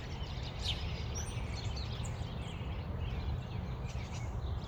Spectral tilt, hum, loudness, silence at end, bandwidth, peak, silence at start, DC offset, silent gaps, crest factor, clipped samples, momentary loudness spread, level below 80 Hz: -5 dB/octave; none; -40 LUFS; 0 s; 19 kHz; -24 dBFS; 0 s; under 0.1%; none; 14 dB; under 0.1%; 4 LU; -42 dBFS